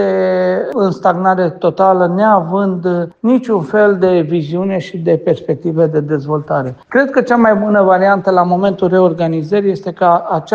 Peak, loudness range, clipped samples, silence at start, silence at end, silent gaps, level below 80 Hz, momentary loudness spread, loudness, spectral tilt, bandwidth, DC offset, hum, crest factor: 0 dBFS; 2 LU; under 0.1%; 0 s; 0 s; none; -56 dBFS; 6 LU; -13 LUFS; -8.5 dB/octave; 7.4 kHz; under 0.1%; none; 12 dB